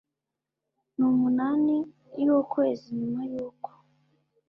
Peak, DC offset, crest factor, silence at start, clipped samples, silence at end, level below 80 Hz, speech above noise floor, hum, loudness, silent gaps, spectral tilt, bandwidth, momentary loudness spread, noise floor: -12 dBFS; under 0.1%; 14 dB; 1 s; under 0.1%; 0.8 s; -70 dBFS; 62 dB; none; -26 LUFS; none; -9.5 dB/octave; 5.8 kHz; 15 LU; -87 dBFS